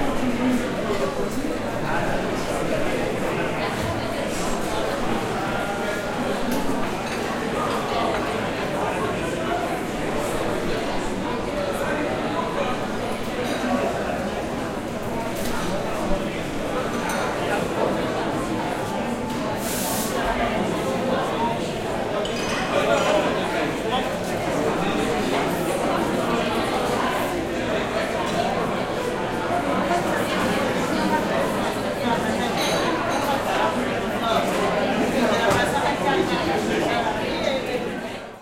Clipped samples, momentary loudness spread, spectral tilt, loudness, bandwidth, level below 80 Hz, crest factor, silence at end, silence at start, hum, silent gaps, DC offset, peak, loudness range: under 0.1%; 5 LU; -4.5 dB/octave; -24 LUFS; 16.5 kHz; -40 dBFS; 16 dB; 0 s; 0 s; none; none; under 0.1%; -6 dBFS; 4 LU